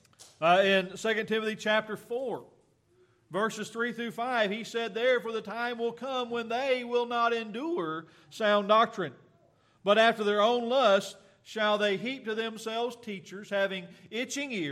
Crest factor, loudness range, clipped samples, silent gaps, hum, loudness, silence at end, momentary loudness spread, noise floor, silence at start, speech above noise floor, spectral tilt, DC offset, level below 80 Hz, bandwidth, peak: 18 dB; 6 LU; under 0.1%; none; none; -29 LUFS; 0 s; 14 LU; -66 dBFS; 0.2 s; 37 dB; -4 dB/octave; under 0.1%; -80 dBFS; 14.5 kHz; -12 dBFS